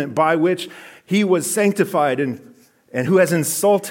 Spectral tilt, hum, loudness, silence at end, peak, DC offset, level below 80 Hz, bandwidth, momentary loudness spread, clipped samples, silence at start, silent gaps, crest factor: -5 dB/octave; none; -18 LUFS; 0 s; -4 dBFS; under 0.1%; -70 dBFS; 17 kHz; 10 LU; under 0.1%; 0 s; none; 14 dB